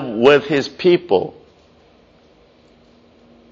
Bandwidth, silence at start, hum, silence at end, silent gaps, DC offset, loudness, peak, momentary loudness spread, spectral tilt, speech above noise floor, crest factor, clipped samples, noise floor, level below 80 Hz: 7.4 kHz; 0 s; none; 2.2 s; none; under 0.1%; -16 LUFS; 0 dBFS; 8 LU; -4 dB/octave; 37 dB; 18 dB; under 0.1%; -51 dBFS; -58 dBFS